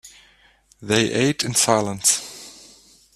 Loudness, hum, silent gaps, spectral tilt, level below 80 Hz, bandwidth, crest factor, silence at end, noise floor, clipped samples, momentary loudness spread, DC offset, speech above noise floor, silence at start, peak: -19 LUFS; none; none; -3 dB/octave; -58 dBFS; 15.5 kHz; 22 dB; 0.65 s; -56 dBFS; under 0.1%; 21 LU; under 0.1%; 37 dB; 0.05 s; 0 dBFS